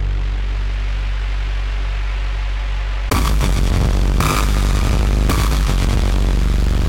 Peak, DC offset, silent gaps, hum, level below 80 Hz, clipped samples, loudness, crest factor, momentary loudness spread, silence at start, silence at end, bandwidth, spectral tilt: -4 dBFS; under 0.1%; none; none; -16 dBFS; under 0.1%; -19 LUFS; 12 dB; 6 LU; 0 s; 0 s; 16.5 kHz; -5 dB/octave